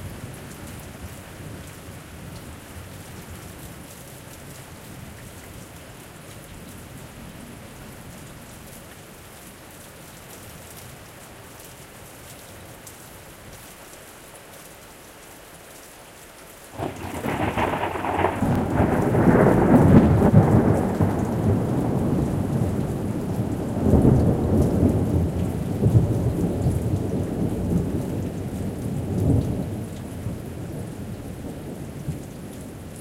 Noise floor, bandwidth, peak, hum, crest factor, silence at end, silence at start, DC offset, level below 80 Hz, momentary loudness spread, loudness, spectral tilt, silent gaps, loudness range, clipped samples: -44 dBFS; 16.5 kHz; -2 dBFS; none; 22 dB; 0 s; 0 s; under 0.1%; -38 dBFS; 23 LU; -22 LUFS; -7.5 dB/octave; none; 23 LU; under 0.1%